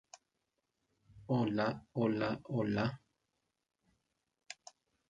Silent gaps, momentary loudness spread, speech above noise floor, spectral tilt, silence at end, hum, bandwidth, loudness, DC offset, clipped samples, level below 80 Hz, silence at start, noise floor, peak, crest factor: none; 18 LU; 51 dB; -7 dB/octave; 0.55 s; none; 9.2 kHz; -36 LUFS; under 0.1%; under 0.1%; -70 dBFS; 1.15 s; -85 dBFS; -20 dBFS; 20 dB